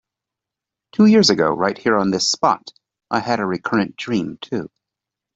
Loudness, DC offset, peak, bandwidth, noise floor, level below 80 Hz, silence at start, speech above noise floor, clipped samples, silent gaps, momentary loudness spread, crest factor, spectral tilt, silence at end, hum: -18 LUFS; under 0.1%; -2 dBFS; 8 kHz; -86 dBFS; -60 dBFS; 1 s; 68 dB; under 0.1%; none; 14 LU; 16 dB; -4.5 dB/octave; 0.7 s; none